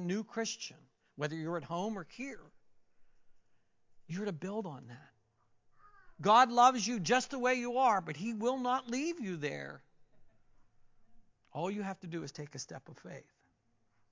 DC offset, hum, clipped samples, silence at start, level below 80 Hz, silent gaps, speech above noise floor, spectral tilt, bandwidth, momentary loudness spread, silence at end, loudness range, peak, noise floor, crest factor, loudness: under 0.1%; none; under 0.1%; 0 s; -76 dBFS; none; 40 dB; -4 dB/octave; 7.6 kHz; 21 LU; 0.9 s; 15 LU; -14 dBFS; -74 dBFS; 22 dB; -33 LUFS